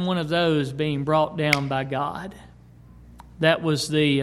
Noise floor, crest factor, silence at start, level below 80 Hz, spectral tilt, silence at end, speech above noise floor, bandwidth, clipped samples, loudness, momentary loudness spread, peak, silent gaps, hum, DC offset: -48 dBFS; 22 dB; 0 s; -52 dBFS; -5.5 dB/octave; 0 s; 25 dB; 16 kHz; under 0.1%; -23 LUFS; 7 LU; -2 dBFS; none; 60 Hz at -50 dBFS; under 0.1%